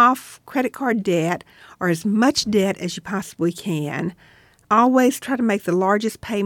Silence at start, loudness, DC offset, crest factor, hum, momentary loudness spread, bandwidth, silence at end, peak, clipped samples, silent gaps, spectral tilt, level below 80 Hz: 0 s; -21 LUFS; under 0.1%; 16 dB; none; 11 LU; 18 kHz; 0 s; -4 dBFS; under 0.1%; none; -5 dB/octave; -58 dBFS